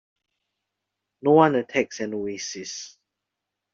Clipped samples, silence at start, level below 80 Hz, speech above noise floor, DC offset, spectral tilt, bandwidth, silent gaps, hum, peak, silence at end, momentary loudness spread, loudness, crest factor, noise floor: under 0.1%; 1.25 s; -72 dBFS; 61 dB; under 0.1%; -5 dB/octave; 7.6 kHz; none; none; -4 dBFS; 0.85 s; 17 LU; -23 LUFS; 22 dB; -84 dBFS